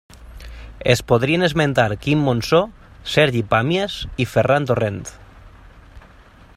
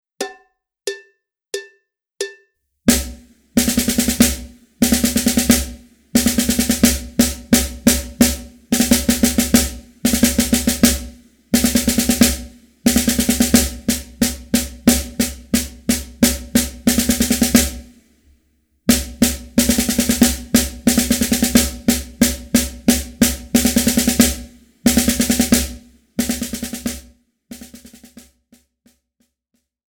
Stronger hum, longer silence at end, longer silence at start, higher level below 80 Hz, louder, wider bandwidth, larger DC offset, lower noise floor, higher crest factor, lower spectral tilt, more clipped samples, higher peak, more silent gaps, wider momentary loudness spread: neither; second, 0.55 s vs 2.2 s; about the same, 0.15 s vs 0.2 s; second, -42 dBFS vs -32 dBFS; about the same, -18 LUFS vs -16 LUFS; second, 15.5 kHz vs over 20 kHz; neither; second, -46 dBFS vs -71 dBFS; about the same, 20 dB vs 18 dB; first, -5.5 dB/octave vs -3 dB/octave; neither; about the same, 0 dBFS vs 0 dBFS; neither; about the same, 16 LU vs 14 LU